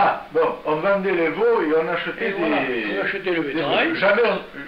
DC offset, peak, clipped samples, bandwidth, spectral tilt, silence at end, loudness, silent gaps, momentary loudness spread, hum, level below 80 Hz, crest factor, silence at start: 0.2%; -8 dBFS; under 0.1%; 5.6 kHz; -7 dB/octave; 0 s; -21 LUFS; none; 5 LU; none; -56 dBFS; 12 dB; 0 s